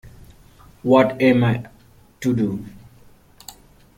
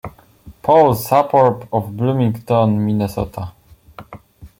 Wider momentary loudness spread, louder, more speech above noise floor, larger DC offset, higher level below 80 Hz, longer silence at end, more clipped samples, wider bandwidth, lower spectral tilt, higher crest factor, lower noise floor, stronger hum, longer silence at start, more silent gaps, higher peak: first, 25 LU vs 13 LU; second, -19 LUFS vs -16 LUFS; first, 32 dB vs 28 dB; neither; second, -52 dBFS vs -46 dBFS; first, 1.2 s vs 0.1 s; neither; about the same, 16 kHz vs 17 kHz; about the same, -7.5 dB/octave vs -7.5 dB/octave; about the same, 20 dB vs 16 dB; first, -49 dBFS vs -43 dBFS; neither; about the same, 0.05 s vs 0.05 s; neither; about the same, -2 dBFS vs 0 dBFS